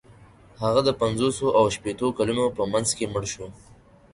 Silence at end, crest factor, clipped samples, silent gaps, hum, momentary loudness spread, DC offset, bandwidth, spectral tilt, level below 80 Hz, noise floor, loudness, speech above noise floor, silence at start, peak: 0.6 s; 18 dB; under 0.1%; none; none; 9 LU; under 0.1%; 11.5 kHz; -4.5 dB/octave; -50 dBFS; -51 dBFS; -24 LUFS; 27 dB; 0.1 s; -8 dBFS